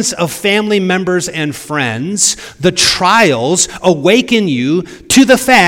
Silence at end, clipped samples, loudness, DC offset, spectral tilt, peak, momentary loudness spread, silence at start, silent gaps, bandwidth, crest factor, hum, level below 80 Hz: 0 s; 0.9%; -11 LUFS; under 0.1%; -3 dB/octave; 0 dBFS; 8 LU; 0 s; none; over 20 kHz; 12 dB; none; -44 dBFS